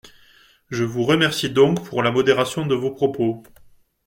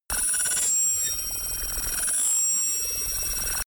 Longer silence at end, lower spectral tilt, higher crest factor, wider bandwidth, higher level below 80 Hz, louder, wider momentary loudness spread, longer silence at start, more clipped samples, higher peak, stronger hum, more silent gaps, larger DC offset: first, 0.65 s vs 0.05 s; first, -5.5 dB/octave vs 1 dB/octave; about the same, 18 dB vs 14 dB; second, 16.5 kHz vs over 20 kHz; second, -56 dBFS vs -42 dBFS; first, -20 LUFS vs -23 LUFS; about the same, 7 LU vs 6 LU; about the same, 0.05 s vs 0.1 s; neither; first, -2 dBFS vs -12 dBFS; neither; neither; neither